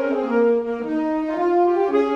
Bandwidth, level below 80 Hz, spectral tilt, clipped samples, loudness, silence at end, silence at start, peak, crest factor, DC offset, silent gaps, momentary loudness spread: 7 kHz; -56 dBFS; -7 dB/octave; under 0.1%; -20 LUFS; 0 s; 0 s; -8 dBFS; 12 dB; under 0.1%; none; 5 LU